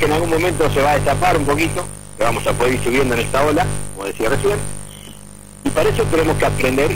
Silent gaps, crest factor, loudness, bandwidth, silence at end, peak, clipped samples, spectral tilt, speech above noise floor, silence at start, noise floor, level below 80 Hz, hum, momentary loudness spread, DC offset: none; 14 dB; -17 LUFS; 16.5 kHz; 0 s; -2 dBFS; under 0.1%; -5 dB/octave; 22 dB; 0 s; -38 dBFS; -32 dBFS; 50 Hz at -30 dBFS; 14 LU; under 0.1%